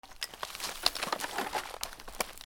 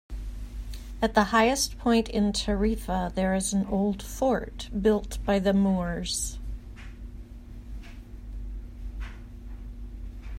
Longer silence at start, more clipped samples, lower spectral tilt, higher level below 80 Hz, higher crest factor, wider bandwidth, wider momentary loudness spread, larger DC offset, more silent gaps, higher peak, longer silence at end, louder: about the same, 0.05 s vs 0.1 s; neither; second, -0.5 dB/octave vs -4.5 dB/octave; second, -56 dBFS vs -38 dBFS; first, 32 dB vs 20 dB; first, over 20 kHz vs 16 kHz; second, 10 LU vs 20 LU; neither; neither; about the same, -6 dBFS vs -8 dBFS; about the same, 0 s vs 0 s; second, -35 LUFS vs -26 LUFS